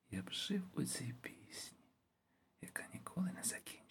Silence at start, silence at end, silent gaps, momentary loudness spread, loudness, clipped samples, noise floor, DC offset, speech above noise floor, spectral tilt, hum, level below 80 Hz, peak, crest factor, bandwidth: 0.1 s; 0.05 s; none; 11 LU; -44 LUFS; under 0.1%; -80 dBFS; under 0.1%; 36 dB; -3.5 dB/octave; none; -80 dBFS; -24 dBFS; 22 dB; 17.5 kHz